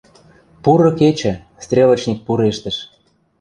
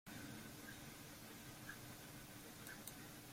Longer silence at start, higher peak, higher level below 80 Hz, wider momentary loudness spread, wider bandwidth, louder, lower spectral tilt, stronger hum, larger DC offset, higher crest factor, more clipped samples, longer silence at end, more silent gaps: first, 0.65 s vs 0.05 s; first, -2 dBFS vs -34 dBFS; first, -48 dBFS vs -72 dBFS; first, 12 LU vs 2 LU; second, 10 kHz vs 16.5 kHz; first, -16 LUFS vs -54 LUFS; first, -6.5 dB/octave vs -3.5 dB/octave; neither; neither; second, 14 dB vs 22 dB; neither; first, 0.55 s vs 0 s; neither